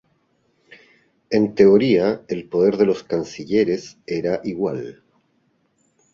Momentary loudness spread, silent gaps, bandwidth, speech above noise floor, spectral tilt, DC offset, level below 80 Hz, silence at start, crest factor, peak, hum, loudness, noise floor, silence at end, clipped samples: 13 LU; none; 7.4 kHz; 46 dB; -7 dB/octave; under 0.1%; -58 dBFS; 1.3 s; 18 dB; -2 dBFS; none; -20 LUFS; -65 dBFS; 1.25 s; under 0.1%